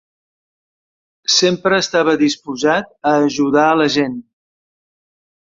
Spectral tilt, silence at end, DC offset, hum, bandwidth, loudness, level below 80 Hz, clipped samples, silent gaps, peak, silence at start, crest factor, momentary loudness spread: -3.5 dB/octave; 1.2 s; under 0.1%; none; 7.8 kHz; -15 LUFS; -58 dBFS; under 0.1%; none; -2 dBFS; 1.3 s; 16 dB; 6 LU